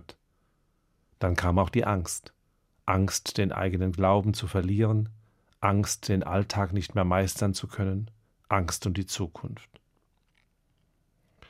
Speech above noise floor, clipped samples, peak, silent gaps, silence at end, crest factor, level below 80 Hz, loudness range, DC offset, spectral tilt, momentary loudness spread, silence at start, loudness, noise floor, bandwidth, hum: 44 dB; under 0.1%; -6 dBFS; none; 1.9 s; 22 dB; -54 dBFS; 6 LU; under 0.1%; -5.5 dB/octave; 10 LU; 1.2 s; -28 LUFS; -70 dBFS; 15.5 kHz; none